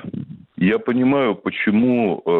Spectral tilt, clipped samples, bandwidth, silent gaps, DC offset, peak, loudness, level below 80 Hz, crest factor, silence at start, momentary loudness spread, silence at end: -9.5 dB/octave; under 0.1%; 4.2 kHz; none; under 0.1%; -8 dBFS; -18 LUFS; -58 dBFS; 10 dB; 0 s; 15 LU; 0 s